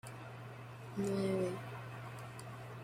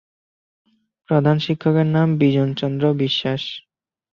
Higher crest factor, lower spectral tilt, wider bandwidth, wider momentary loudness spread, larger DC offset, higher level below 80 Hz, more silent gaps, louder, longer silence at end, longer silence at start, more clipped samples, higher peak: about the same, 18 dB vs 16 dB; second, -6.5 dB/octave vs -8 dB/octave; first, 16 kHz vs 6.8 kHz; first, 14 LU vs 8 LU; neither; second, -72 dBFS vs -58 dBFS; neither; second, -42 LUFS vs -19 LUFS; second, 0 s vs 0.55 s; second, 0.05 s vs 1.1 s; neither; second, -24 dBFS vs -4 dBFS